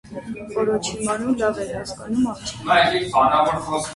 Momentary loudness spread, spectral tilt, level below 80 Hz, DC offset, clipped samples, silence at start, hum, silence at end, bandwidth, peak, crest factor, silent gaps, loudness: 12 LU; -4 dB/octave; -48 dBFS; under 0.1%; under 0.1%; 0.05 s; none; 0 s; 11.5 kHz; -4 dBFS; 18 dB; none; -21 LUFS